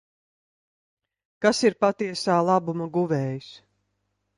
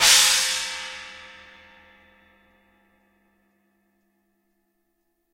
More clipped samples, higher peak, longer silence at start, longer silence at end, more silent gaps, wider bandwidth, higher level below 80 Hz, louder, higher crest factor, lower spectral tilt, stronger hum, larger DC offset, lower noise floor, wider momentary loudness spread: neither; about the same, -4 dBFS vs -2 dBFS; first, 1.4 s vs 0 s; second, 0.8 s vs 4.05 s; neither; second, 11.5 kHz vs 16 kHz; second, -70 dBFS vs -60 dBFS; second, -24 LUFS vs -19 LUFS; about the same, 22 dB vs 24 dB; first, -5.5 dB/octave vs 3 dB/octave; first, 50 Hz at -55 dBFS vs none; neither; about the same, -76 dBFS vs -73 dBFS; second, 7 LU vs 28 LU